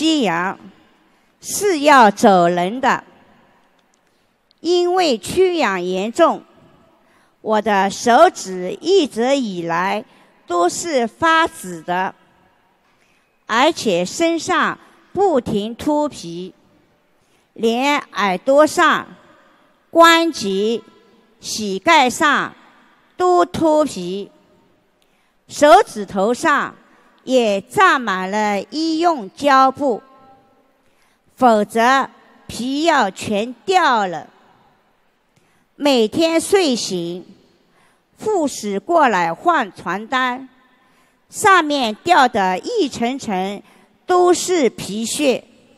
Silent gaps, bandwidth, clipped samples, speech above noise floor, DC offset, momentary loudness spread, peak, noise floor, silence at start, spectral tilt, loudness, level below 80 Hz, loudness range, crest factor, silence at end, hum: none; 15 kHz; under 0.1%; 44 dB; under 0.1%; 14 LU; 0 dBFS; -61 dBFS; 0 s; -3.5 dB/octave; -16 LUFS; -58 dBFS; 4 LU; 18 dB; 0.4 s; none